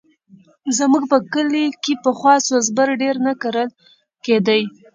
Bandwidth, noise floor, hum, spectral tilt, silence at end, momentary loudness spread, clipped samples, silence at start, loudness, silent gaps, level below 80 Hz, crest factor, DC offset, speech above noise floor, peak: 9.4 kHz; -50 dBFS; none; -3.5 dB/octave; 0.25 s; 8 LU; under 0.1%; 0.65 s; -17 LUFS; none; -70 dBFS; 18 dB; under 0.1%; 33 dB; 0 dBFS